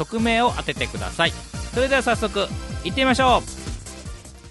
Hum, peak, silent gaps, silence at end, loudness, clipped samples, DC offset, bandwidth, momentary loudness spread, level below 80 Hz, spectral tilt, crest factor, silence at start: none; -4 dBFS; none; 0 s; -21 LUFS; under 0.1%; under 0.1%; 11.5 kHz; 17 LU; -36 dBFS; -4 dB/octave; 20 dB; 0 s